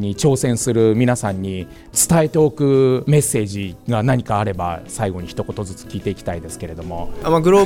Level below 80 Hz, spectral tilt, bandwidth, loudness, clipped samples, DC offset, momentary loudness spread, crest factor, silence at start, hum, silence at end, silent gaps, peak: -40 dBFS; -5.5 dB/octave; 16.5 kHz; -18 LUFS; under 0.1%; under 0.1%; 14 LU; 16 dB; 0 s; none; 0 s; none; -2 dBFS